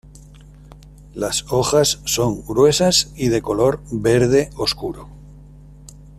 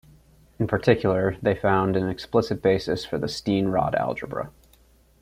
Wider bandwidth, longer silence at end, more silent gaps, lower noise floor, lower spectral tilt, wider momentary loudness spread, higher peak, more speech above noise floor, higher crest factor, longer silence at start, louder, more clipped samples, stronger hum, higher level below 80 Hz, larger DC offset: second, 14 kHz vs 15.5 kHz; second, 0.1 s vs 0.75 s; neither; second, -42 dBFS vs -57 dBFS; second, -4 dB/octave vs -7 dB/octave; about the same, 11 LU vs 9 LU; about the same, -4 dBFS vs -4 dBFS; second, 24 dB vs 34 dB; about the same, 16 dB vs 20 dB; first, 0.85 s vs 0.6 s; first, -18 LUFS vs -24 LUFS; neither; neither; first, -42 dBFS vs -50 dBFS; neither